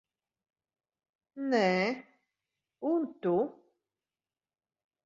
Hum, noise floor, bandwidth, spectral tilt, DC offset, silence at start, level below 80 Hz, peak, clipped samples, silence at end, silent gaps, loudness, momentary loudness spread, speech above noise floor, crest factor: none; under -90 dBFS; 7.6 kHz; -6.5 dB/octave; under 0.1%; 1.35 s; -78 dBFS; -14 dBFS; under 0.1%; 1.55 s; none; -31 LUFS; 11 LU; over 60 dB; 20 dB